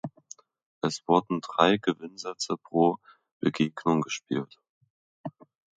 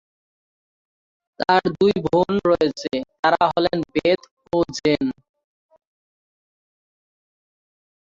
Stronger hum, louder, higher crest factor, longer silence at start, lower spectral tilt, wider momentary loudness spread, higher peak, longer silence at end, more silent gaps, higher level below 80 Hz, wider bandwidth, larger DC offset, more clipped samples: neither; second, -27 LUFS vs -20 LUFS; about the same, 24 dB vs 20 dB; second, 0.05 s vs 1.4 s; about the same, -5 dB/octave vs -5.5 dB/octave; first, 20 LU vs 9 LU; about the same, -4 dBFS vs -2 dBFS; second, 0.5 s vs 3.05 s; first, 0.66-0.81 s, 3.31-3.40 s, 4.69-4.81 s, 4.90-5.24 s vs 3.19-3.23 s, 4.31-4.37 s; second, -70 dBFS vs -54 dBFS; first, 9.4 kHz vs 7.6 kHz; neither; neither